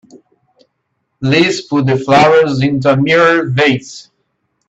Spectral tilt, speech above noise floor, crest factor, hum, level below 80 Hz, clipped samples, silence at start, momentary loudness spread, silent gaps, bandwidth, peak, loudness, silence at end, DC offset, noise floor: -6 dB/octave; 57 dB; 14 dB; none; -50 dBFS; under 0.1%; 0.15 s; 7 LU; none; 8.2 kHz; 0 dBFS; -11 LUFS; 0.7 s; under 0.1%; -68 dBFS